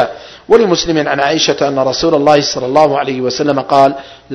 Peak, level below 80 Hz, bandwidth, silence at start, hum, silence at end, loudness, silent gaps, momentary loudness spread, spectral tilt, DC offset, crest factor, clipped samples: 0 dBFS; -44 dBFS; 11 kHz; 0 s; none; 0 s; -12 LUFS; none; 6 LU; -4 dB/octave; under 0.1%; 12 dB; 0.9%